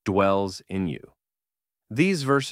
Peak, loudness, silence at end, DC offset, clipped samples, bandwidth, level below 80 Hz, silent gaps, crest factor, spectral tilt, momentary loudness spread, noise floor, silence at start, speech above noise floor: -8 dBFS; -25 LUFS; 0 s; under 0.1%; under 0.1%; 15.5 kHz; -60 dBFS; none; 18 dB; -6 dB/octave; 11 LU; under -90 dBFS; 0.05 s; over 66 dB